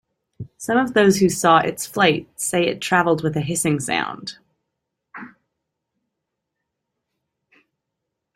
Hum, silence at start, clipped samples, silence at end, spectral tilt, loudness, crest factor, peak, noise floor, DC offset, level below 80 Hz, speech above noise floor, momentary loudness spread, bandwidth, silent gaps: none; 0.4 s; under 0.1%; 3.1 s; -4 dB/octave; -19 LUFS; 20 dB; -2 dBFS; -80 dBFS; under 0.1%; -58 dBFS; 61 dB; 21 LU; 16 kHz; none